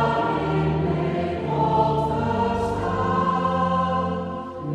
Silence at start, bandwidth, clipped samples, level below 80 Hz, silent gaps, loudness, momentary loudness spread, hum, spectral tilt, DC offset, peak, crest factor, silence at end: 0 s; 9.8 kHz; under 0.1%; -42 dBFS; none; -23 LUFS; 5 LU; none; -8 dB/octave; under 0.1%; -8 dBFS; 14 dB; 0 s